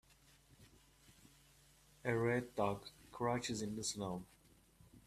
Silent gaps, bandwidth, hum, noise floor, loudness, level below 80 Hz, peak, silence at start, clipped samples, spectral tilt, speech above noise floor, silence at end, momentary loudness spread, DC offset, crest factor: none; 15 kHz; none; -68 dBFS; -41 LUFS; -70 dBFS; -22 dBFS; 0.6 s; under 0.1%; -4.5 dB/octave; 28 dB; 0.05 s; 12 LU; under 0.1%; 22 dB